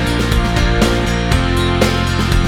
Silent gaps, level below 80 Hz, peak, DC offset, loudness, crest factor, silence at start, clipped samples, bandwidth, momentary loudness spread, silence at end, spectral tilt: none; -20 dBFS; 0 dBFS; under 0.1%; -15 LUFS; 14 dB; 0 s; under 0.1%; 16.5 kHz; 2 LU; 0 s; -5.5 dB/octave